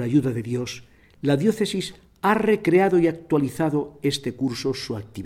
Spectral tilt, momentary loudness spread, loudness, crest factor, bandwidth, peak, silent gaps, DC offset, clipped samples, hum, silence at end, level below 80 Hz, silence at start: -6 dB/octave; 11 LU; -23 LUFS; 16 dB; 16 kHz; -8 dBFS; none; under 0.1%; under 0.1%; none; 0 s; -56 dBFS; 0 s